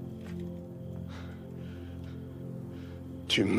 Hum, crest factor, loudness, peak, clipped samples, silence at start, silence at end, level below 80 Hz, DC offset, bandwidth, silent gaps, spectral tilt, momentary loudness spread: none; 22 dB; -39 LUFS; -14 dBFS; under 0.1%; 0 s; 0 s; -56 dBFS; under 0.1%; 15.5 kHz; none; -5 dB/octave; 8 LU